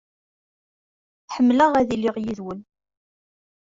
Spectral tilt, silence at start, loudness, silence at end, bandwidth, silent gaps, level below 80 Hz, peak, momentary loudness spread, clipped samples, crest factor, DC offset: -6 dB/octave; 1.3 s; -20 LUFS; 1 s; 7.6 kHz; none; -58 dBFS; -6 dBFS; 18 LU; under 0.1%; 18 dB; under 0.1%